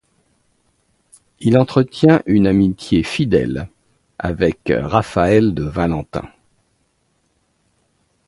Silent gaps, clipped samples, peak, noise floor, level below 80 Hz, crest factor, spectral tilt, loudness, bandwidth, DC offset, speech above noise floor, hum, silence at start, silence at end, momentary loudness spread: none; under 0.1%; 0 dBFS; -64 dBFS; -40 dBFS; 18 dB; -7.5 dB/octave; -16 LUFS; 11.5 kHz; under 0.1%; 49 dB; none; 1.4 s; 2 s; 13 LU